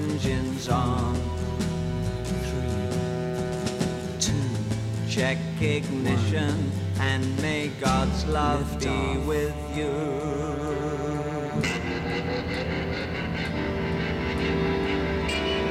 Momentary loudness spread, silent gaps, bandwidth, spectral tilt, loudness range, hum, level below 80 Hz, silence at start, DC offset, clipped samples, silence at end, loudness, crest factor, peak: 4 LU; none; 15 kHz; -5.5 dB/octave; 3 LU; none; -38 dBFS; 0 s; under 0.1%; under 0.1%; 0 s; -27 LUFS; 16 dB; -10 dBFS